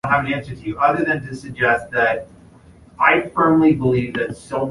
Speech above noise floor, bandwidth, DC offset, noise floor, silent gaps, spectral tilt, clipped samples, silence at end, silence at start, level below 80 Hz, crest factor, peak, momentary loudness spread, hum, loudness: 28 dB; 11.5 kHz; under 0.1%; -46 dBFS; none; -7 dB/octave; under 0.1%; 0 s; 0.05 s; -48 dBFS; 18 dB; -2 dBFS; 10 LU; none; -18 LUFS